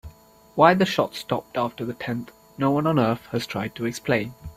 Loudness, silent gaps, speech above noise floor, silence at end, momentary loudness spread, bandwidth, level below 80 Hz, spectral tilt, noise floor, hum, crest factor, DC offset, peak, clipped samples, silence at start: -24 LUFS; none; 26 dB; 0.05 s; 13 LU; 16 kHz; -54 dBFS; -6 dB/octave; -50 dBFS; none; 22 dB; under 0.1%; -2 dBFS; under 0.1%; 0.05 s